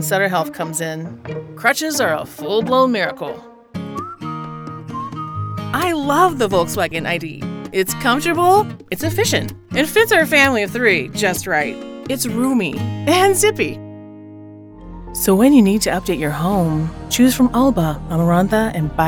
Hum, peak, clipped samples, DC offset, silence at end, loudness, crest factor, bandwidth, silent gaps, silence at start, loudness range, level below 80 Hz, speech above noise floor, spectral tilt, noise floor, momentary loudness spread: none; 0 dBFS; under 0.1%; under 0.1%; 0 s; -17 LUFS; 18 dB; over 20 kHz; none; 0 s; 5 LU; -42 dBFS; 21 dB; -4.5 dB/octave; -37 dBFS; 16 LU